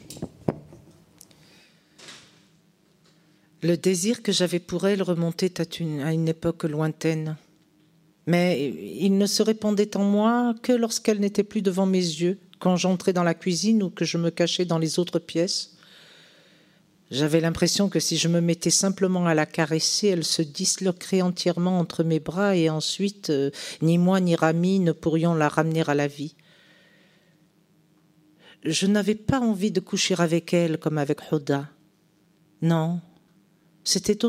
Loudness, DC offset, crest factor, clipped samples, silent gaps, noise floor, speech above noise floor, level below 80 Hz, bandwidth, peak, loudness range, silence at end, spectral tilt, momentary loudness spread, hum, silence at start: -24 LUFS; under 0.1%; 22 dB; under 0.1%; none; -62 dBFS; 39 dB; -60 dBFS; 15.5 kHz; -2 dBFS; 5 LU; 0 s; -5 dB/octave; 8 LU; none; 0.05 s